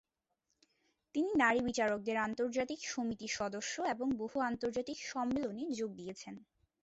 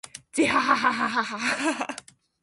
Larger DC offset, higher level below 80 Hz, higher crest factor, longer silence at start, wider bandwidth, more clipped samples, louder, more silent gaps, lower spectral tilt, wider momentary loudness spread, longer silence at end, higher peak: neither; about the same, -68 dBFS vs -64 dBFS; about the same, 22 dB vs 20 dB; first, 1.15 s vs 0.05 s; second, 8 kHz vs 11.5 kHz; neither; second, -36 LUFS vs -24 LUFS; neither; about the same, -3 dB/octave vs -2.5 dB/octave; about the same, 11 LU vs 11 LU; about the same, 0.4 s vs 0.45 s; second, -16 dBFS vs -6 dBFS